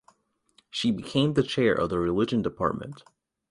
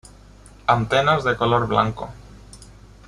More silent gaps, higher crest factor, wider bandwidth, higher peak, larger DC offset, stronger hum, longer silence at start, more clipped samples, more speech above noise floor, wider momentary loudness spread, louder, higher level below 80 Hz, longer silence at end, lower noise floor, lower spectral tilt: neither; about the same, 18 dB vs 20 dB; about the same, 11.5 kHz vs 11.5 kHz; second, -8 dBFS vs -4 dBFS; neither; second, none vs 50 Hz at -40 dBFS; first, 0.75 s vs 0.45 s; neither; first, 40 dB vs 26 dB; about the same, 9 LU vs 11 LU; second, -26 LUFS vs -20 LUFS; second, -52 dBFS vs -44 dBFS; about the same, 0.5 s vs 0.45 s; first, -66 dBFS vs -46 dBFS; about the same, -6 dB/octave vs -6 dB/octave